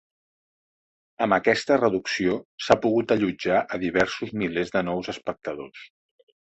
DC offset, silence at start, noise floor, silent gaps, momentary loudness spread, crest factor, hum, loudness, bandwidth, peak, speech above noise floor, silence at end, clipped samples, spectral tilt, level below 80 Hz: under 0.1%; 1.2 s; under -90 dBFS; 2.45-2.58 s; 11 LU; 22 dB; none; -24 LUFS; 8.2 kHz; -4 dBFS; over 66 dB; 0.6 s; under 0.1%; -5.5 dB/octave; -56 dBFS